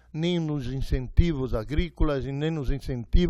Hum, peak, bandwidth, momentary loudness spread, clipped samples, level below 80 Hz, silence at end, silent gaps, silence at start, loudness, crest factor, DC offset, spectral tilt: none; -6 dBFS; 11 kHz; 6 LU; under 0.1%; -28 dBFS; 0 s; none; 0.15 s; -28 LUFS; 18 dB; under 0.1%; -7.5 dB/octave